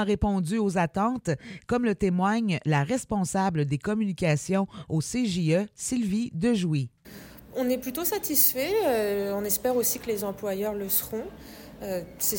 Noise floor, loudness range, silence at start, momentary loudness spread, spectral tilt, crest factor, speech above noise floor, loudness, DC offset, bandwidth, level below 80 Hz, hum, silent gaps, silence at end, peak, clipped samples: -46 dBFS; 3 LU; 0 s; 10 LU; -5 dB/octave; 20 dB; 20 dB; -26 LUFS; under 0.1%; 17 kHz; -48 dBFS; none; none; 0 s; -6 dBFS; under 0.1%